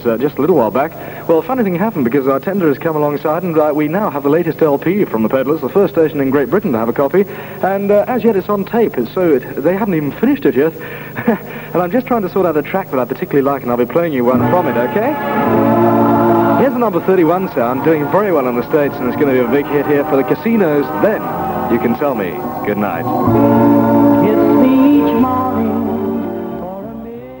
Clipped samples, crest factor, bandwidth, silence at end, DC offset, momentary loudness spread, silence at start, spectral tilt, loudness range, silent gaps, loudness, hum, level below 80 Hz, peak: under 0.1%; 14 dB; 16.5 kHz; 0 s; under 0.1%; 8 LU; 0 s; -8.5 dB/octave; 4 LU; none; -14 LUFS; 50 Hz at -40 dBFS; -46 dBFS; 0 dBFS